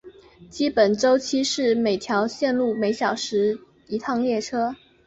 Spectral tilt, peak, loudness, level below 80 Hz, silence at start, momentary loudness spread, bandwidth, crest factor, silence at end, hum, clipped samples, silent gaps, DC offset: -4 dB/octave; -6 dBFS; -23 LUFS; -62 dBFS; 0.05 s; 8 LU; 8.2 kHz; 18 dB; 0.3 s; none; under 0.1%; none; under 0.1%